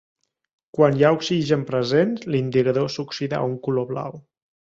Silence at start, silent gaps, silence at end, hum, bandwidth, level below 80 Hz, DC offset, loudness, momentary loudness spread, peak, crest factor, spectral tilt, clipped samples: 0.75 s; none; 0.5 s; none; 7.8 kHz; -60 dBFS; under 0.1%; -21 LUFS; 10 LU; -4 dBFS; 18 dB; -6.5 dB/octave; under 0.1%